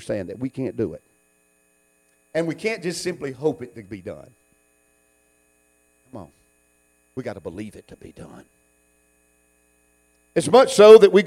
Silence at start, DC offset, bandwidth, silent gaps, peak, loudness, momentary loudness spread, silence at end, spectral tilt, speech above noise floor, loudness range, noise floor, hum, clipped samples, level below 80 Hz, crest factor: 0.1 s; under 0.1%; 12.5 kHz; none; 0 dBFS; -18 LUFS; 31 LU; 0 s; -5 dB/octave; 45 dB; 18 LU; -63 dBFS; 60 Hz at -60 dBFS; under 0.1%; -60 dBFS; 22 dB